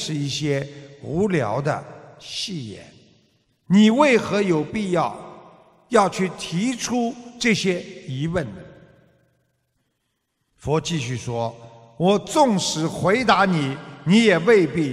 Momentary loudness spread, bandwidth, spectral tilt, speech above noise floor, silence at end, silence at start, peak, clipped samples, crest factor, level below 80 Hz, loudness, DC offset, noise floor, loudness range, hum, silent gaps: 16 LU; 13.5 kHz; -5 dB/octave; 54 dB; 0 s; 0 s; -2 dBFS; under 0.1%; 20 dB; -54 dBFS; -21 LUFS; under 0.1%; -74 dBFS; 10 LU; none; none